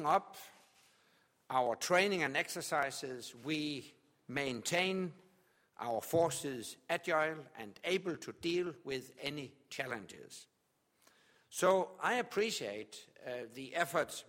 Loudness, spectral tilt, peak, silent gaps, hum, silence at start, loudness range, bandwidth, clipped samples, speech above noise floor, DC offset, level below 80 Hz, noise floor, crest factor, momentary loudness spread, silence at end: -37 LUFS; -3.5 dB/octave; -16 dBFS; none; none; 0 s; 5 LU; 16.5 kHz; under 0.1%; 41 dB; under 0.1%; -78 dBFS; -78 dBFS; 22 dB; 15 LU; 0.05 s